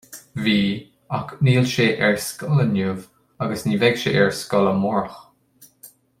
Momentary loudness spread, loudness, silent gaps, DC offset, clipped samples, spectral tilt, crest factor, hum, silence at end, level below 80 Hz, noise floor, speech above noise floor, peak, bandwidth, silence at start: 11 LU; -20 LUFS; none; under 0.1%; under 0.1%; -5.5 dB/octave; 20 dB; none; 0.35 s; -56 dBFS; -53 dBFS; 34 dB; -2 dBFS; 16 kHz; 0.1 s